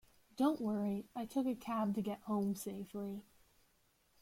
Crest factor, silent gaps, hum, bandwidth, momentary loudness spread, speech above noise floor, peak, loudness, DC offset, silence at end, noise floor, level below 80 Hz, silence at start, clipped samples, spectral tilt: 16 dB; none; none; 16.5 kHz; 9 LU; 36 dB; -24 dBFS; -39 LUFS; under 0.1%; 1 s; -74 dBFS; -74 dBFS; 0.35 s; under 0.1%; -6.5 dB/octave